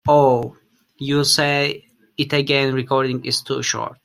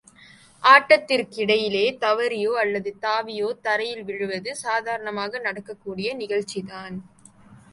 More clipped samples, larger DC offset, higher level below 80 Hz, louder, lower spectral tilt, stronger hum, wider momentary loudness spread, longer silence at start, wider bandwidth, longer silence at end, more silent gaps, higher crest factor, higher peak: neither; neither; first, -56 dBFS vs -68 dBFS; first, -18 LUFS vs -22 LUFS; about the same, -4 dB/octave vs -3.5 dB/octave; neither; second, 14 LU vs 17 LU; second, 0.05 s vs 0.6 s; first, 15 kHz vs 11.5 kHz; about the same, 0.1 s vs 0.15 s; neither; about the same, 18 dB vs 22 dB; about the same, -2 dBFS vs -2 dBFS